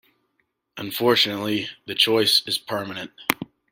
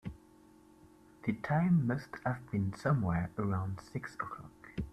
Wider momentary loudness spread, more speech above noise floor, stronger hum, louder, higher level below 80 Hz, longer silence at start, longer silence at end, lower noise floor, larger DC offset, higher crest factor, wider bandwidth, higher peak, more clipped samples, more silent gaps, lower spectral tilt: about the same, 13 LU vs 14 LU; first, 50 dB vs 27 dB; neither; first, -21 LUFS vs -35 LUFS; second, -66 dBFS vs -58 dBFS; first, 0.75 s vs 0.05 s; first, 0.25 s vs 0 s; first, -72 dBFS vs -61 dBFS; neither; first, 24 dB vs 18 dB; first, 16.5 kHz vs 11.5 kHz; first, 0 dBFS vs -18 dBFS; neither; neither; second, -3 dB/octave vs -8.5 dB/octave